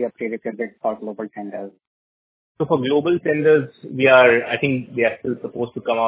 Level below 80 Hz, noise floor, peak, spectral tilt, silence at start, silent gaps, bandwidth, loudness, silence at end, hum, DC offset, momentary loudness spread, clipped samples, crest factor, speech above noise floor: -62 dBFS; under -90 dBFS; 0 dBFS; -9.5 dB/octave; 0 s; 1.87-2.55 s; 4 kHz; -19 LUFS; 0 s; none; under 0.1%; 17 LU; under 0.1%; 20 dB; over 71 dB